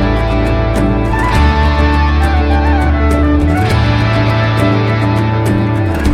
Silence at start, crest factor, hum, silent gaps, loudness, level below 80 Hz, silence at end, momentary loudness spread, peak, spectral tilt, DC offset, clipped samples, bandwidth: 0 s; 10 dB; none; none; -12 LUFS; -16 dBFS; 0 s; 2 LU; 0 dBFS; -7.5 dB/octave; under 0.1%; under 0.1%; 12.5 kHz